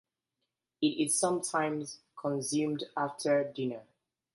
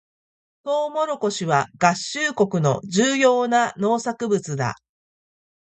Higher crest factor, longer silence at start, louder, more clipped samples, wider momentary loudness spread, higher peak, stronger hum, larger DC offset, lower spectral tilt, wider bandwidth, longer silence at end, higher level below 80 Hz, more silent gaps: about the same, 18 dB vs 22 dB; first, 0.8 s vs 0.65 s; second, -32 LUFS vs -21 LUFS; neither; about the same, 10 LU vs 9 LU; second, -14 dBFS vs 0 dBFS; neither; neither; about the same, -4 dB/octave vs -4.5 dB/octave; first, 12 kHz vs 9.4 kHz; second, 0.55 s vs 0.85 s; second, -80 dBFS vs -64 dBFS; neither